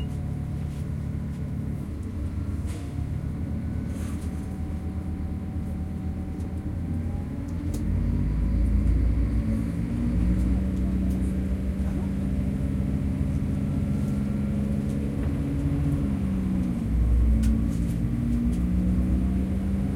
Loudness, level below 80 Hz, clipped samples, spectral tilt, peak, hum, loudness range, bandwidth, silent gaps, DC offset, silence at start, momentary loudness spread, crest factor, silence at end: -28 LUFS; -30 dBFS; under 0.1%; -9 dB/octave; -12 dBFS; none; 6 LU; 12.5 kHz; none; under 0.1%; 0 s; 7 LU; 14 dB; 0 s